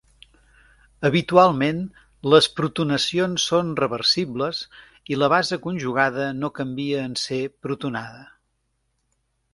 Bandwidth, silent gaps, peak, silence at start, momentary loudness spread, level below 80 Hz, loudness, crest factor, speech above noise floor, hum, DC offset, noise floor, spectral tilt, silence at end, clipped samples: 11.5 kHz; none; 0 dBFS; 1 s; 13 LU; -58 dBFS; -22 LUFS; 22 dB; 50 dB; none; under 0.1%; -72 dBFS; -4.5 dB/octave; 1.3 s; under 0.1%